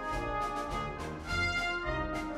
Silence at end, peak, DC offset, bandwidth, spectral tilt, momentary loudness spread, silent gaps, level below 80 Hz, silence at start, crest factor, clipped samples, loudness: 0 s; -20 dBFS; under 0.1%; 15.5 kHz; -4.5 dB/octave; 6 LU; none; -44 dBFS; 0 s; 14 dB; under 0.1%; -34 LUFS